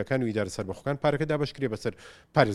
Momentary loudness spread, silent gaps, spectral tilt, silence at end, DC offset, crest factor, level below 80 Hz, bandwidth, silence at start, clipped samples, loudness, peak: 8 LU; none; -6.5 dB/octave; 0 s; under 0.1%; 24 dB; -54 dBFS; 12.5 kHz; 0 s; under 0.1%; -29 LUFS; -4 dBFS